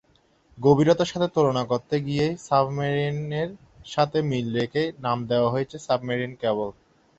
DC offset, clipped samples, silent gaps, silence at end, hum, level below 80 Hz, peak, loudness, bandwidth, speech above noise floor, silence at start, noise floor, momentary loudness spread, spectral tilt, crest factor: under 0.1%; under 0.1%; none; 0.5 s; none; -58 dBFS; -4 dBFS; -24 LUFS; 8.2 kHz; 38 dB; 0.55 s; -62 dBFS; 8 LU; -6.5 dB/octave; 20 dB